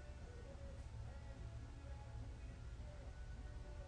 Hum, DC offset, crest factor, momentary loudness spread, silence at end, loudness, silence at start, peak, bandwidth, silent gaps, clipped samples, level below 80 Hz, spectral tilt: none; under 0.1%; 12 dB; 2 LU; 0 s; -55 LUFS; 0 s; -40 dBFS; 10 kHz; none; under 0.1%; -54 dBFS; -6.5 dB/octave